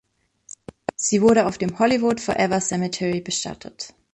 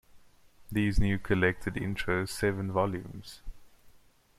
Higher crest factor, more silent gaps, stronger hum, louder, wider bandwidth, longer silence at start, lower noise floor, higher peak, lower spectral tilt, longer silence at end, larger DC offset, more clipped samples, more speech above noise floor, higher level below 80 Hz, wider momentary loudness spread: about the same, 18 dB vs 20 dB; neither; neither; first, -21 LUFS vs -30 LUFS; second, 11 kHz vs 15 kHz; first, 1 s vs 0.15 s; second, -49 dBFS vs -59 dBFS; first, -4 dBFS vs -12 dBFS; second, -4 dB/octave vs -6 dB/octave; second, 0.25 s vs 0.5 s; neither; neither; about the same, 28 dB vs 30 dB; second, -56 dBFS vs -40 dBFS; about the same, 18 LU vs 17 LU